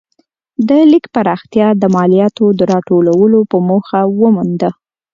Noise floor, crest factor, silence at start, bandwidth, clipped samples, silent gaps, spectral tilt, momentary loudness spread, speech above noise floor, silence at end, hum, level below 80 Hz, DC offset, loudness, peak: -59 dBFS; 10 dB; 0.6 s; 7.4 kHz; under 0.1%; none; -8.5 dB/octave; 6 LU; 49 dB; 0.4 s; none; -54 dBFS; under 0.1%; -11 LUFS; 0 dBFS